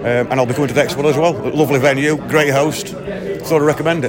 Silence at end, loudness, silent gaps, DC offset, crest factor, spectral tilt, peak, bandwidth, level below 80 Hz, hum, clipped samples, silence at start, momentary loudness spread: 0 s; -16 LUFS; none; under 0.1%; 14 dB; -5.5 dB/octave; 0 dBFS; 16.5 kHz; -46 dBFS; none; under 0.1%; 0 s; 10 LU